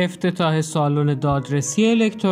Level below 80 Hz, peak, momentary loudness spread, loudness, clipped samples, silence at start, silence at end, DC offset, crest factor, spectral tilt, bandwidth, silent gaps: -50 dBFS; -6 dBFS; 4 LU; -20 LUFS; under 0.1%; 0 s; 0 s; under 0.1%; 14 dB; -5.5 dB/octave; 13 kHz; none